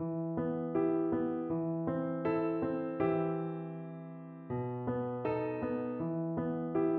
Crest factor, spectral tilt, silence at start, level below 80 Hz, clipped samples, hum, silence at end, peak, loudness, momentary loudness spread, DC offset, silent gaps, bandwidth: 14 dB; -9 dB/octave; 0 s; -66 dBFS; under 0.1%; none; 0 s; -20 dBFS; -35 LUFS; 9 LU; under 0.1%; none; 4.3 kHz